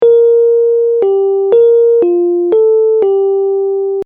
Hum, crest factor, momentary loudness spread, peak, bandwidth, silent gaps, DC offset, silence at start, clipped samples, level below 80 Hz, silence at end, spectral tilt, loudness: none; 8 dB; 5 LU; 0 dBFS; 3.6 kHz; none; under 0.1%; 0 s; under 0.1%; -62 dBFS; 0 s; -9 dB/octave; -10 LUFS